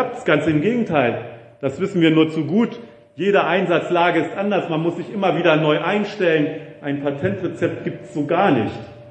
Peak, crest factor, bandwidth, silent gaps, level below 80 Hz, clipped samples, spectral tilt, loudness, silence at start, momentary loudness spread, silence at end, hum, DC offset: 0 dBFS; 18 dB; 8.6 kHz; none; -60 dBFS; under 0.1%; -7 dB/octave; -19 LUFS; 0 s; 11 LU; 0 s; none; under 0.1%